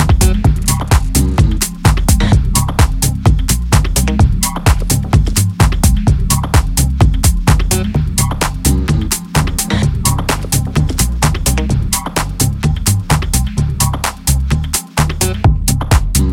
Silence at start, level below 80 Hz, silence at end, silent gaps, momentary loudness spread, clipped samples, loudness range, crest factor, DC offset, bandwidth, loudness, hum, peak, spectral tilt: 0 s; -16 dBFS; 0 s; none; 4 LU; under 0.1%; 2 LU; 12 dB; under 0.1%; 17.5 kHz; -14 LUFS; none; 0 dBFS; -4.5 dB/octave